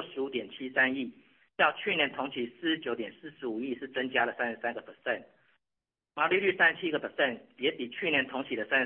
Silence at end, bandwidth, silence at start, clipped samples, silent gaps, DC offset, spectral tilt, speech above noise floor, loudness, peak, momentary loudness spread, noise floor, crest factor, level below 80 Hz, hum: 0 s; 4.2 kHz; 0 s; under 0.1%; none; under 0.1%; -7.5 dB/octave; 58 dB; -30 LUFS; -12 dBFS; 11 LU; -89 dBFS; 20 dB; -80 dBFS; none